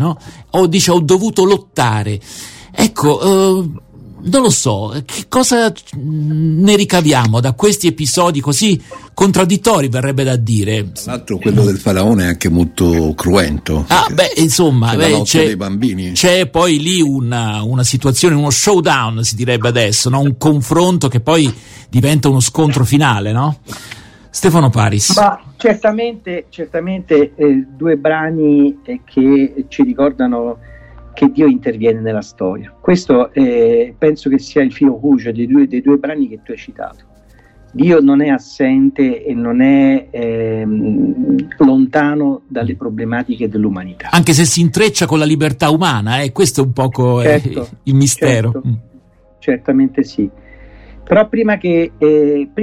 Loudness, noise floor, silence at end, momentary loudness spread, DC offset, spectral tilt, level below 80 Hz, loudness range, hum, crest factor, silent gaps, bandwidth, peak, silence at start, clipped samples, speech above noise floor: -13 LUFS; -46 dBFS; 0 s; 10 LU; under 0.1%; -5 dB/octave; -38 dBFS; 3 LU; none; 12 dB; none; 16.5 kHz; 0 dBFS; 0 s; under 0.1%; 33 dB